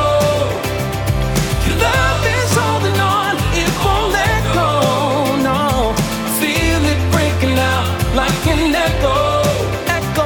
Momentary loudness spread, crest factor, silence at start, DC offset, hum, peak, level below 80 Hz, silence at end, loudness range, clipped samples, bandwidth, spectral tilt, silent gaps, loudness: 3 LU; 14 dB; 0 s; under 0.1%; none; -2 dBFS; -26 dBFS; 0 s; 1 LU; under 0.1%; 19.5 kHz; -5 dB/octave; none; -15 LUFS